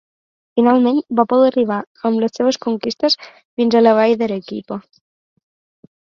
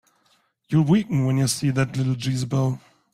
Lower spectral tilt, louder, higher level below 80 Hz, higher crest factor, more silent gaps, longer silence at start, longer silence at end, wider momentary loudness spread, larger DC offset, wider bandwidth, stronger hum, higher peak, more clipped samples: about the same, -5.5 dB/octave vs -6 dB/octave; first, -16 LUFS vs -22 LUFS; second, -64 dBFS vs -54 dBFS; about the same, 16 dB vs 14 dB; first, 1.87-1.95 s, 3.45-3.57 s vs none; second, 0.55 s vs 0.7 s; first, 1.3 s vs 0.35 s; first, 14 LU vs 6 LU; neither; second, 7.2 kHz vs 15.5 kHz; neither; first, 0 dBFS vs -8 dBFS; neither